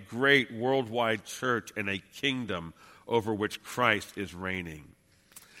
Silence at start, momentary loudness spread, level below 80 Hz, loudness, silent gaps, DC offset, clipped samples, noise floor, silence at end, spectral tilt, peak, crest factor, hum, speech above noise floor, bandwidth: 0 s; 13 LU; -64 dBFS; -30 LUFS; none; under 0.1%; under 0.1%; -56 dBFS; 0 s; -4.5 dB/octave; -8 dBFS; 24 dB; none; 26 dB; 16.5 kHz